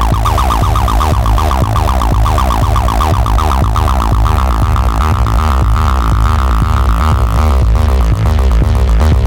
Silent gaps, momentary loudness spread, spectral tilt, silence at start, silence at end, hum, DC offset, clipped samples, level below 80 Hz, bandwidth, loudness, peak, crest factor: none; 1 LU; -6.5 dB/octave; 0 s; 0 s; none; 0.5%; under 0.1%; -12 dBFS; 17 kHz; -12 LUFS; -2 dBFS; 8 dB